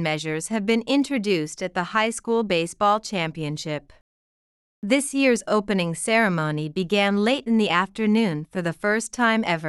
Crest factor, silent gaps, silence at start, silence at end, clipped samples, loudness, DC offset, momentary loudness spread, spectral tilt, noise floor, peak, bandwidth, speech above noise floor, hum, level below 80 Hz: 16 dB; 4.01-4.82 s; 0 s; 0 s; under 0.1%; -23 LUFS; under 0.1%; 8 LU; -4.5 dB/octave; under -90 dBFS; -6 dBFS; 12.5 kHz; over 67 dB; none; -60 dBFS